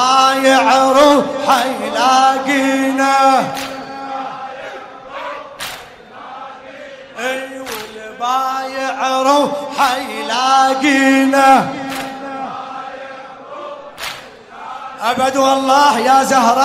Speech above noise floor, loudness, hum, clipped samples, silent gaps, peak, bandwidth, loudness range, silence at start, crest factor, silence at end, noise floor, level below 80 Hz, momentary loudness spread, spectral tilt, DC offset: 23 dB; -13 LUFS; none; under 0.1%; none; 0 dBFS; 16 kHz; 14 LU; 0 s; 14 dB; 0 s; -35 dBFS; -56 dBFS; 20 LU; -2.5 dB/octave; under 0.1%